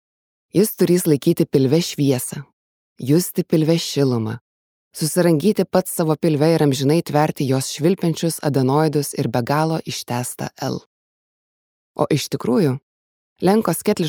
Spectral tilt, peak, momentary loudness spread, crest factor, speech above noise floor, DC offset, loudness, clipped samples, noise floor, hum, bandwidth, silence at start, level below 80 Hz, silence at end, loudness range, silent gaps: -6 dB/octave; -2 dBFS; 10 LU; 18 dB; over 72 dB; under 0.1%; -19 LUFS; under 0.1%; under -90 dBFS; none; over 20 kHz; 0.55 s; -62 dBFS; 0 s; 6 LU; 2.53-2.96 s, 4.41-4.91 s, 10.86-11.95 s, 12.83-13.36 s